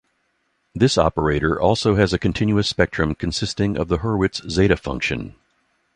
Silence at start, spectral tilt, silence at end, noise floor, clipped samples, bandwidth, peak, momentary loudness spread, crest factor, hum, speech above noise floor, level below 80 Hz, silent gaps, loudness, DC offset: 0.75 s; -5.5 dB/octave; 0.65 s; -69 dBFS; under 0.1%; 10.5 kHz; 0 dBFS; 6 LU; 20 dB; none; 49 dB; -36 dBFS; none; -20 LUFS; under 0.1%